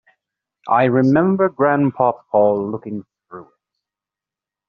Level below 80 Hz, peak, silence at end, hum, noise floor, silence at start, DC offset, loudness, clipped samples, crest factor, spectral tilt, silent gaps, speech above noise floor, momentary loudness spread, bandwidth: -58 dBFS; -2 dBFS; 1.25 s; none; -88 dBFS; 0.65 s; under 0.1%; -17 LUFS; under 0.1%; 16 dB; -7.5 dB/octave; none; 72 dB; 15 LU; 6.2 kHz